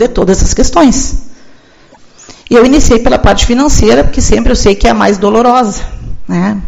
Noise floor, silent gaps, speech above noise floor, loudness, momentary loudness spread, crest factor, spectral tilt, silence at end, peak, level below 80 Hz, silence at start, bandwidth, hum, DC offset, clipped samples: -39 dBFS; none; 33 dB; -8 LUFS; 10 LU; 8 dB; -4.5 dB/octave; 0 s; 0 dBFS; -16 dBFS; 0 s; 8.2 kHz; none; under 0.1%; 2%